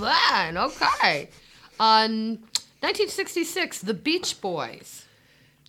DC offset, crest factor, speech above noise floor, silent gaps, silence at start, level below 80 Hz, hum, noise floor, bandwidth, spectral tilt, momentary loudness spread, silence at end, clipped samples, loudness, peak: under 0.1%; 20 dB; 34 dB; none; 0 s; -60 dBFS; none; -58 dBFS; 17 kHz; -2.5 dB/octave; 12 LU; 0.65 s; under 0.1%; -24 LUFS; -4 dBFS